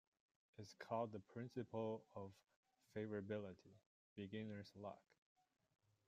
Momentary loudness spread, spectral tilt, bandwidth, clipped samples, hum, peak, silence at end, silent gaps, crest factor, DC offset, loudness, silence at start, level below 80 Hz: 15 LU; -7 dB/octave; 14 kHz; under 0.1%; none; -32 dBFS; 1.05 s; 2.56-2.63 s, 3.86-4.16 s; 20 dB; under 0.1%; -52 LUFS; 0.6 s; -88 dBFS